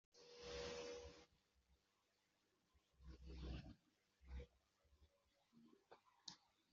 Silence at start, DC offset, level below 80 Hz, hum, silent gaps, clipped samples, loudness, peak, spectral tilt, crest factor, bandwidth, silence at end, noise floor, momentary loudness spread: 0.15 s; under 0.1%; -66 dBFS; none; none; under 0.1%; -57 LUFS; -38 dBFS; -4 dB/octave; 22 dB; 7.4 kHz; 0.3 s; -86 dBFS; 14 LU